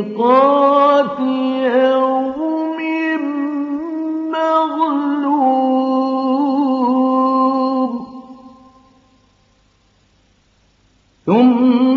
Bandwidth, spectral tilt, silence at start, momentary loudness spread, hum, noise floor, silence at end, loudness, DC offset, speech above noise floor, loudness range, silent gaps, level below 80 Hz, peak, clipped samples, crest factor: 6.2 kHz; -7.5 dB/octave; 0 s; 10 LU; none; -56 dBFS; 0 s; -15 LUFS; under 0.1%; 43 dB; 7 LU; none; -64 dBFS; -2 dBFS; under 0.1%; 14 dB